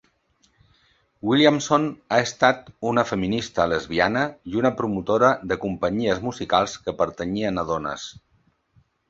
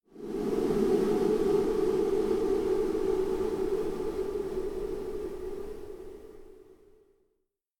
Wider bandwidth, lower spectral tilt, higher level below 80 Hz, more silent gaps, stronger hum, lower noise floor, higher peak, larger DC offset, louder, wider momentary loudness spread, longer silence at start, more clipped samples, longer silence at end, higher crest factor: second, 8 kHz vs 17 kHz; second, -5 dB/octave vs -7 dB/octave; second, -52 dBFS vs -46 dBFS; neither; neither; second, -65 dBFS vs -79 dBFS; first, -2 dBFS vs -14 dBFS; neither; first, -22 LUFS vs -30 LUFS; second, 9 LU vs 15 LU; first, 1.25 s vs 0.15 s; neither; about the same, 1 s vs 1.05 s; first, 22 dB vs 16 dB